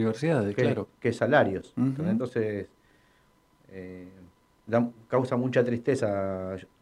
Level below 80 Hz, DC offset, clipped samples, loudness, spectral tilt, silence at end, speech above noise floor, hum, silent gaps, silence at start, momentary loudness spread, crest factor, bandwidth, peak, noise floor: -68 dBFS; under 0.1%; under 0.1%; -27 LUFS; -7.5 dB/octave; 0.15 s; 37 dB; none; none; 0 s; 19 LU; 20 dB; 11 kHz; -8 dBFS; -64 dBFS